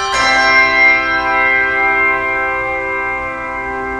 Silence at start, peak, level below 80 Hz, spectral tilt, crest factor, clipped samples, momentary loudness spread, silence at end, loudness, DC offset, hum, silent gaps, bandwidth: 0 s; 0 dBFS; -40 dBFS; -2.5 dB/octave; 14 dB; under 0.1%; 11 LU; 0 s; -12 LUFS; under 0.1%; none; none; 11.5 kHz